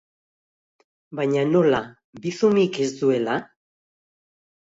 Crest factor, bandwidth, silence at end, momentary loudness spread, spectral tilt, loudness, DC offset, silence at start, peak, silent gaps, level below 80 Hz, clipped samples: 18 dB; 7.8 kHz; 1.25 s; 13 LU; -6 dB/octave; -22 LUFS; under 0.1%; 1.1 s; -6 dBFS; 2.04-2.13 s; -64 dBFS; under 0.1%